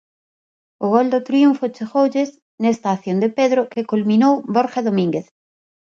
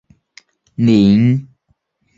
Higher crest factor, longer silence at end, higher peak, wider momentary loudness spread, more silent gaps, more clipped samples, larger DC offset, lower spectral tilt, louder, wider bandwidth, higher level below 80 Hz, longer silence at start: about the same, 16 dB vs 14 dB; about the same, 0.75 s vs 0.75 s; about the same, -2 dBFS vs -2 dBFS; second, 8 LU vs 12 LU; first, 2.42-2.58 s vs none; neither; neither; second, -7 dB/octave vs -8.5 dB/octave; second, -18 LUFS vs -13 LUFS; about the same, 7.4 kHz vs 7.6 kHz; second, -68 dBFS vs -48 dBFS; about the same, 0.8 s vs 0.8 s